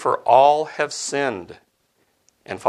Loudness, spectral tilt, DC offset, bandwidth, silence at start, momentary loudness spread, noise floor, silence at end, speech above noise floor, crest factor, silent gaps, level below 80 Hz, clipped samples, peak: -18 LUFS; -3 dB/octave; under 0.1%; 12 kHz; 0 s; 17 LU; -66 dBFS; 0 s; 47 dB; 20 dB; none; -68 dBFS; under 0.1%; -2 dBFS